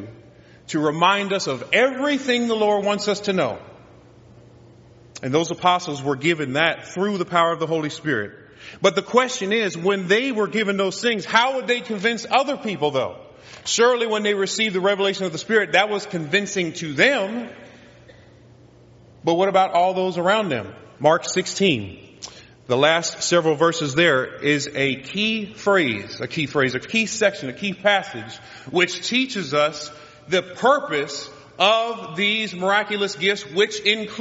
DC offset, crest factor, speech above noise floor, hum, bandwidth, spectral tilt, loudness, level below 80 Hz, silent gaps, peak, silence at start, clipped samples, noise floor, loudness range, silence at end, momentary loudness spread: under 0.1%; 20 dB; 28 dB; none; 8 kHz; -2.5 dB/octave; -21 LUFS; -64 dBFS; none; 0 dBFS; 0 s; under 0.1%; -49 dBFS; 3 LU; 0 s; 10 LU